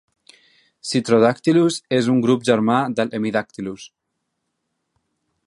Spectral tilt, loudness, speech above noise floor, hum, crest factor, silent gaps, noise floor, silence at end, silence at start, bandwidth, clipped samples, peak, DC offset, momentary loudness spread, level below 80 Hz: -5.5 dB/octave; -18 LUFS; 58 dB; none; 18 dB; none; -76 dBFS; 1.6 s; 0.85 s; 11.5 kHz; under 0.1%; -2 dBFS; under 0.1%; 15 LU; -64 dBFS